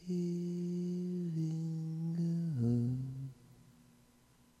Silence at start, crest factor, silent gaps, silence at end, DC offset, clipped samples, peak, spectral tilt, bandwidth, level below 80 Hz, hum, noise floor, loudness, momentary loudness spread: 0 s; 14 dB; none; 0.9 s; under 0.1%; under 0.1%; -24 dBFS; -9.5 dB/octave; 9.4 kHz; -70 dBFS; none; -67 dBFS; -37 LUFS; 7 LU